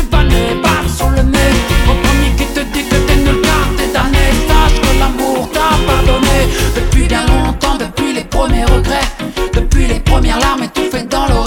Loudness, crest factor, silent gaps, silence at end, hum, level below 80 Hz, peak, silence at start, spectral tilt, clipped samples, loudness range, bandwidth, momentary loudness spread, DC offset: -13 LUFS; 10 dB; none; 0 s; none; -14 dBFS; 0 dBFS; 0 s; -5 dB/octave; under 0.1%; 2 LU; 18 kHz; 5 LU; under 0.1%